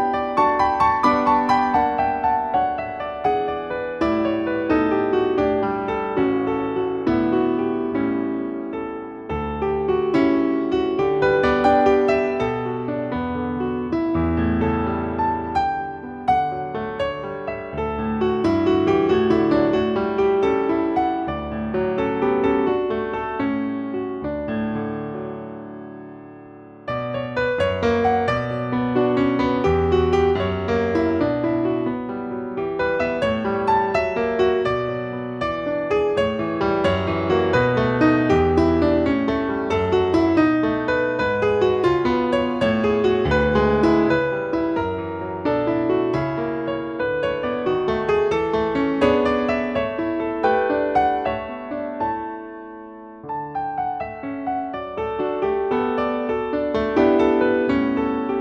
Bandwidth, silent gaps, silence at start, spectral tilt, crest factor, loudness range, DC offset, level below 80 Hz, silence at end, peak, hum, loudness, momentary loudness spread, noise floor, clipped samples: 7.8 kHz; none; 0 s; -7.5 dB/octave; 16 dB; 6 LU; under 0.1%; -44 dBFS; 0 s; -4 dBFS; none; -21 LUFS; 10 LU; -41 dBFS; under 0.1%